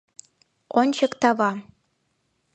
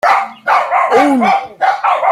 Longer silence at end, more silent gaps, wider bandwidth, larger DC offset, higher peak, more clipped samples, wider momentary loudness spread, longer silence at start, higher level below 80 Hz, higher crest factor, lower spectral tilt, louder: first, 0.95 s vs 0 s; neither; second, 9 kHz vs 15 kHz; neither; second, -4 dBFS vs 0 dBFS; neither; about the same, 5 LU vs 4 LU; first, 0.75 s vs 0.05 s; second, -70 dBFS vs -62 dBFS; first, 22 dB vs 12 dB; about the same, -4.5 dB/octave vs -4.5 dB/octave; second, -22 LUFS vs -12 LUFS